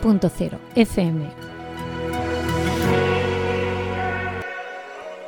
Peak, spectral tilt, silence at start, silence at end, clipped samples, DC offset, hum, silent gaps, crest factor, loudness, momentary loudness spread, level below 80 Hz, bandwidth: -2 dBFS; -6.5 dB/octave; 0 s; 0 s; under 0.1%; under 0.1%; none; none; 20 dB; -23 LUFS; 14 LU; -40 dBFS; 18 kHz